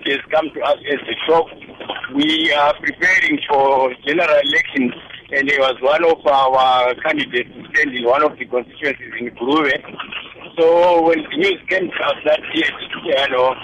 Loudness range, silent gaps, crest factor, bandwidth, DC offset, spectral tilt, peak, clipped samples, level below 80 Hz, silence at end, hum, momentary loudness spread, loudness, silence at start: 3 LU; none; 12 dB; 10.5 kHz; under 0.1%; -4 dB/octave; -4 dBFS; under 0.1%; -54 dBFS; 0 s; none; 11 LU; -16 LUFS; 0 s